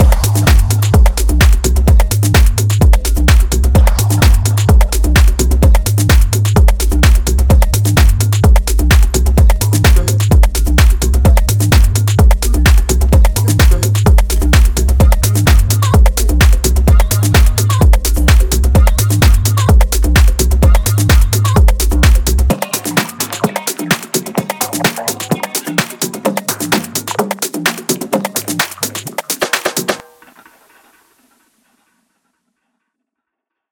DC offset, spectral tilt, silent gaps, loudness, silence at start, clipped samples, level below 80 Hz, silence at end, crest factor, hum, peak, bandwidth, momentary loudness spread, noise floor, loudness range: under 0.1%; -4.5 dB/octave; none; -12 LUFS; 0 s; under 0.1%; -12 dBFS; 3.7 s; 10 dB; none; 0 dBFS; 19 kHz; 6 LU; -79 dBFS; 6 LU